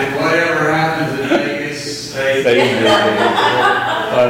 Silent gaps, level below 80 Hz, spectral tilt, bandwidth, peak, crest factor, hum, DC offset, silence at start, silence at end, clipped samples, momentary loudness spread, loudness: none; -50 dBFS; -4.5 dB/octave; 16.5 kHz; -2 dBFS; 12 dB; none; under 0.1%; 0 s; 0 s; under 0.1%; 8 LU; -14 LUFS